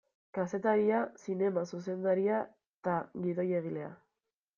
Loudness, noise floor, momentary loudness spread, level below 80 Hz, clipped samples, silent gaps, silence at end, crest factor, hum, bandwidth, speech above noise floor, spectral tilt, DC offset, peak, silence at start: -33 LUFS; -88 dBFS; 12 LU; -78 dBFS; under 0.1%; 2.69-2.82 s; 0.6 s; 16 dB; none; 7.2 kHz; 56 dB; -8 dB/octave; under 0.1%; -18 dBFS; 0.35 s